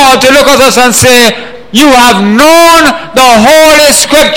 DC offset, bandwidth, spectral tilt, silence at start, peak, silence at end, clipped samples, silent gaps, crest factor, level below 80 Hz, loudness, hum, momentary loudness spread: 4%; over 20 kHz; -2.5 dB/octave; 0 s; 0 dBFS; 0 s; 8%; none; 4 dB; -30 dBFS; -3 LUFS; none; 5 LU